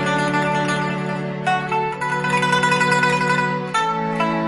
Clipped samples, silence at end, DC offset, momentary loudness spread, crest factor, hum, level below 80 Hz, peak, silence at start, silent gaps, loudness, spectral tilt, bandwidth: under 0.1%; 0 s; under 0.1%; 6 LU; 16 dB; none; -56 dBFS; -4 dBFS; 0 s; none; -19 LUFS; -5 dB/octave; 11.5 kHz